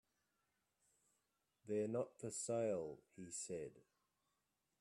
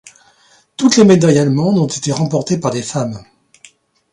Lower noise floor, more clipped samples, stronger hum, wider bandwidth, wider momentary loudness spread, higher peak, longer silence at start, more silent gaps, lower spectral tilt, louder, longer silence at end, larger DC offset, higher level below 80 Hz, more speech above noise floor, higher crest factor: first, -88 dBFS vs -52 dBFS; neither; neither; first, 13 kHz vs 11.5 kHz; about the same, 14 LU vs 13 LU; second, -30 dBFS vs 0 dBFS; first, 1.65 s vs 0.8 s; neither; about the same, -5 dB/octave vs -5.5 dB/octave; second, -45 LUFS vs -14 LUFS; about the same, 1 s vs 0.9 s; neither; second, -84 dBFS vs -54 dBFS; first, 43 dB vs 39 dB; about the same, 18 dB vs 14 dB